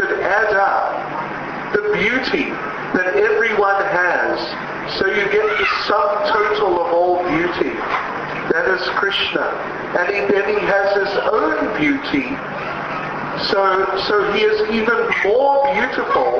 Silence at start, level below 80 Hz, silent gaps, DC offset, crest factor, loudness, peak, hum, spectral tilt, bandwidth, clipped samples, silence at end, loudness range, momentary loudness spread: 0 s; -50 dBFS; none; under 0.1%; 14 dB; -17 LUFS; -4 dBFS; none; -5 dB/octave; 6.6 kHz; under 0.1%; 0 s; 2 LU; 8 LU